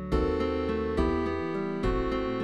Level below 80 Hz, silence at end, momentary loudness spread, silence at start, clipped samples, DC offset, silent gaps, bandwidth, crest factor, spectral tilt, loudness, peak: -36 dBFS; 0 s; 3 LU; 0 s; under 0.1%; 0.3%; none; 10.5 kHz; 14 dB; -8 dB/octave; -29 LUFS; -14 dBFS